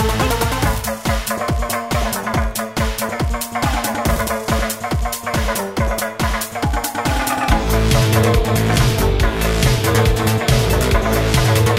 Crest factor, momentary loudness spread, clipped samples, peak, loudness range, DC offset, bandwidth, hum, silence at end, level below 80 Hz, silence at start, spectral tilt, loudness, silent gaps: 16 dB; 6 LU; under 0.1%; -2 dBFS; 4 LU; 0.1%; 16.5 kHz; none; 0 s; -22 dBFS; 0 s; -4.5 dB/octave; -18 LUFS; none